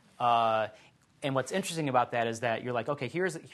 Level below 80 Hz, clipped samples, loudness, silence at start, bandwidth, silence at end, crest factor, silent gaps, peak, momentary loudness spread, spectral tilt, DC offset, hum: -76 dBFS; under 0.1%; -30 LUFS; 0.2 s; 12.5 kHz; 0.05 s; 18 dB; none; -12 dBFS; 7 LU; -5 dB/octave; under 0.1%; none